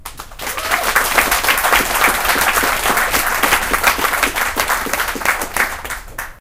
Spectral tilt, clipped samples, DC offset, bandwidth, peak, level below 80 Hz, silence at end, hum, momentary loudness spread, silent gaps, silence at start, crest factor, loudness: -1 dB/octave; under 0.1%; under 0.1%; over 20 kHz; 0 dBFS; -34 dBFS; 0.05 s; none; 11 LU; none; 0 s; 16 dB; -15 LUFS